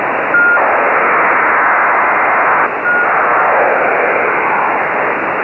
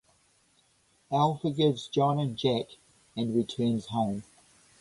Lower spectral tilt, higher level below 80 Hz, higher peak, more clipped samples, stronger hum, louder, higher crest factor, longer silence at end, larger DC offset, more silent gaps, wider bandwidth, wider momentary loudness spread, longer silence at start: about the same, -6.5 dB/octave vs -7 dB/octave; first, -54 dBFS vs -64 dBFS; first, 0 dBFS vs -12 dBFS; neither; neither; first, -11 LUFS vs -29 LUFS; second, 12 dB vs 18 dB; second, 0 s vs 0.6 s; neither; neither; second, 6.2 kHz vs 11.5 kHz; second, 3 LU vs 8 LU; second, 0 s vs 1.1 s